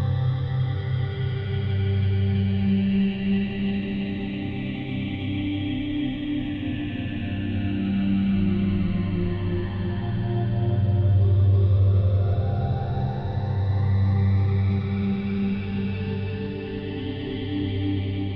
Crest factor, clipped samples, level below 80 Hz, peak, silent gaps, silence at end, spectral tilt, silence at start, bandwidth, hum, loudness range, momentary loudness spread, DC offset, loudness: 10 dB; under 0.1%; -40 dBFS; -12 dBFS; none; 0 s; -10.5 dB/octave; 0 s; 5 kHz; none; 6 LU; 9 LU; under 0.1%; -25 LUFS